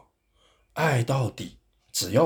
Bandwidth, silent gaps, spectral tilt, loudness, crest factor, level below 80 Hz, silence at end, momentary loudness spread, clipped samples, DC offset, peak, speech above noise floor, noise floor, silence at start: over 20 kHz; none; -5 dB/octave; -26 LUFS; 20 dB; -60 dBFS; 0 s; 16 LU; under 0.1%; under 0.1%; -8 dBFS; 41 dB; -65 dBFS; 0.75 s